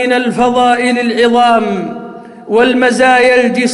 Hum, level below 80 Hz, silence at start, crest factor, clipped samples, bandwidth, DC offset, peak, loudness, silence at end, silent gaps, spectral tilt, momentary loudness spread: none; -50 dBFS; 0 s; 10 dB; under 0.1%; 11.5 kHz; under 0.1%; 0 dBFS; -10 LUFS; 0 s; none; -4 dB/octave; 11 LU